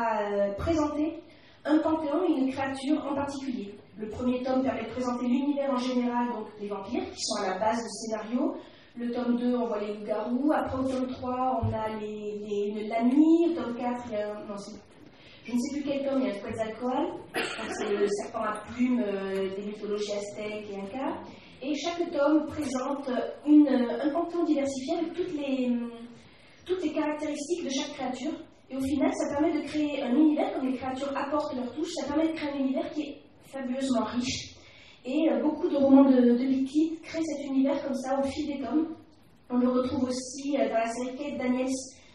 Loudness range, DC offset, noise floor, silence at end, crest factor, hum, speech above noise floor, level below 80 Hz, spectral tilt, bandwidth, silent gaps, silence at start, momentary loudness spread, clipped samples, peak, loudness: 7 LU; under 0.1%; -54 dBFS; 0.2 s; 20 dB; none; 26 dB; -58 dBFS; -5 dB/octave; 11.5 kHz; none; 0 s; 11 LU; under 0.1%; -8 dBFS; -29 LUFS